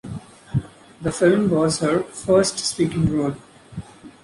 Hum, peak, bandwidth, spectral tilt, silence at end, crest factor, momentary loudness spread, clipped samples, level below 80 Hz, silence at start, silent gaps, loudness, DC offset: none; -4 dBFS; 11.5 kHz; -5.5 dB/octave; 0.15 s; 16 dB; 20 LU; under 0.1%; -46 dBFS; 0.05 s; none; -21 LUFS; under 0.1%